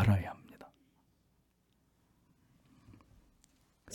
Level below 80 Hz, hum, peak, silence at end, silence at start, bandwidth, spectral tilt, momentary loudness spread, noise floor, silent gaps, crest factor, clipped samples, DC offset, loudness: -62 dBFS; none; -18 dBFS; 0 s; 0 s; 13.5 kHz; -7.5 dB/octave; 29 LU; -74 dBFS; none; 22 dB; under 0.1%; under 0.1%; -35 LUFS